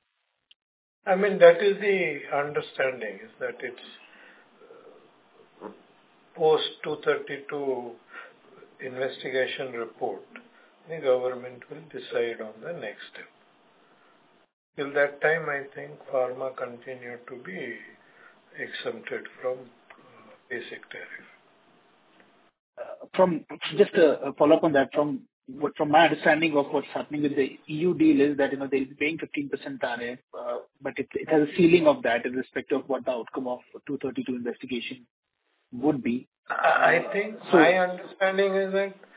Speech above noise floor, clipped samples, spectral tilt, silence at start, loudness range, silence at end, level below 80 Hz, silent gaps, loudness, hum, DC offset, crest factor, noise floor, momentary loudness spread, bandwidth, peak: 51 dB; under 0.1%; -9.5 dB/octave; 1.05 s; 13 LU; 0.25 s; -72 dBFS; 14.53-14.73 s, 22.59-22.73 s, 25.33-25.42 s, 30.23-30.28 s, 35.10-35.23 s, 36.27-36.32 s, 36.38-36.43 s; -26 LUFS; none; under 0.1%; 24 dB; -77 dBFS; 20 LU; 4 kHz; -4 dBFS